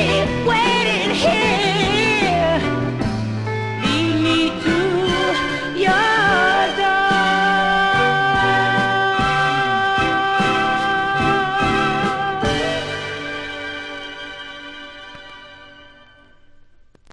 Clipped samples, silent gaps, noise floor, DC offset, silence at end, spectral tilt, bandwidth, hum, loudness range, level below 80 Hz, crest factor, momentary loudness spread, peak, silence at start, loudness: under 0.1%; none; -48 dBFS; under 0.1%; 1.3 s; -4.5 dB/octave; 12 kHz; none; 12 LU; -42 dBFS; 14 dB; 13 LU; -4 dBFS; 0 s; -17 LUFS